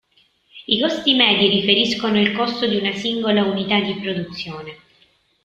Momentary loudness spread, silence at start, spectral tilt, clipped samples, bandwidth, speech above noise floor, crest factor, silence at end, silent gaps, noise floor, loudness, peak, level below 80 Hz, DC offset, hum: 15 LU; 0.55 s; -5 dB/octave; under 0.1%; 7.8 kHz; 41 dB; 20 dB; 0.7 s; none; -60 dBFS; -18 LUFS; 0 dBFS; -58 dBFS; under 0.1%; none